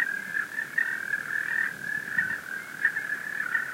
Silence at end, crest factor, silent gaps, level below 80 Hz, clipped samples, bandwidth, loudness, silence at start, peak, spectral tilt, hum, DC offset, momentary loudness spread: 0 s; 20 dB; none; -76 dBFS; under 0.1%; 16 kHz; -29 LUFS; 0 s; -12 dBFS; -2 dB/octave; none; under 0.1%; 4 LU